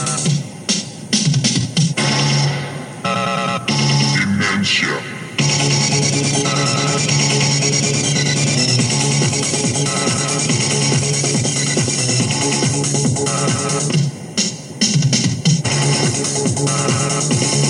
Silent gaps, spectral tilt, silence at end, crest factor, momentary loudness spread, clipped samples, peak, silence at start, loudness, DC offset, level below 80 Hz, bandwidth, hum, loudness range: none; -3.5 dB/octave; 0 s; 14 dB; 5 LU; under 0.1%; -2 dBFS; 0 s; -16 LUFS; under 0.1%; -52 dBFS; 12 kHz; none; 2 LU